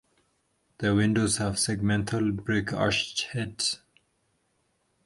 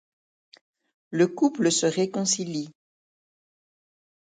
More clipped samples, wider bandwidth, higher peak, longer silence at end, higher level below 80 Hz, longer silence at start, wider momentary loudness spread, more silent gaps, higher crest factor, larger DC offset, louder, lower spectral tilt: neither; first, 11.5 kHz vs 9.6 kHz; about the same, -10 dBFS vs -8 dBFS; second, 1.3 s vs 1.55 s; first, -52 dBFS vs -74 dBFS; second, 0.8 s vs 1.1 s; second, 6 LU vs 11 LU; neither; about the same, 18 dB vs 20 dB; neither; second, -27 LUFS vs -24 LUFS; about the same, -4 dB/octave vs -4 dB/octave